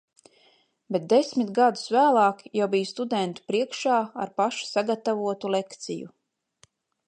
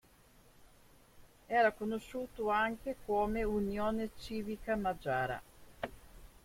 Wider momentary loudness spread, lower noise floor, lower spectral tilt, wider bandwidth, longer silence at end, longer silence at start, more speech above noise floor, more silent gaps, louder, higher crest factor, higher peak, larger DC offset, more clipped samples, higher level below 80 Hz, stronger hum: second, 10 LU vs 13 LU; about the same, -63 dBFS vs -63 dBFS; second, -4.5 dB/octave vs -6 dB/octave; second, 9.8 kHz vs 16.5 kHz; first, 1 s vs 0.15 s; first, 0.9 s vs 0.6 s; first, 38 dB vs 28 dB; neither; first, -25 LUFS vs -36 LUFS; about the same, 18 dB vs 20 dB; first, -8 dBFS vs -16 dBFS; neither; neither; second, -80 dBFS vs -54 dBFS; neither